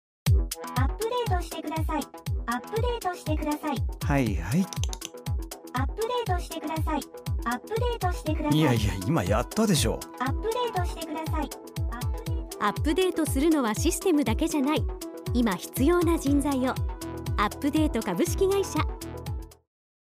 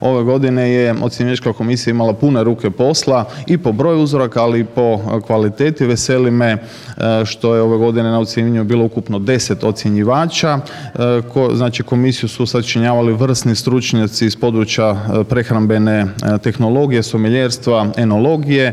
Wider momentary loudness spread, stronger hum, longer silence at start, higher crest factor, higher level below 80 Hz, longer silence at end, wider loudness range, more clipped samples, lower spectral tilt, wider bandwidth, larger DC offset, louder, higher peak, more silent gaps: first, 10 LU vs 4 LU; neither; first, 0.25 s vs 0 s; about the same, 16 dB vs 12 dB; first, -36 dBFS vs -48 dBFS; first, 0.5 s vs 0 s; first, 4 LU vs 1 LU; neither; about the same, -5.5 dB/octave vs -6 dB/octave; first, 16 kHz vs 13.5 kHz; neither; second, -28 LUFS vs -14 LUFS; second, -10 dBFS vs -2 dBFS; neither